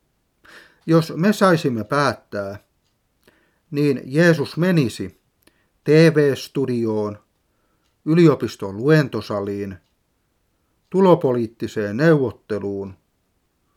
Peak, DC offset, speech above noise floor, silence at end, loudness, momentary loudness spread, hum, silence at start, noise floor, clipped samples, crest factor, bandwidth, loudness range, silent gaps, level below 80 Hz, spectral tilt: -2 dBFS; under 0.1%; 49 dB; 0.85 s; -19 LUFS; 15 LU; none; 0.85 s; -68 dBFS; under 0.1%; 18 dB; 15 kHz; 3 LU; none; -64 dBFS; -7 dB/octave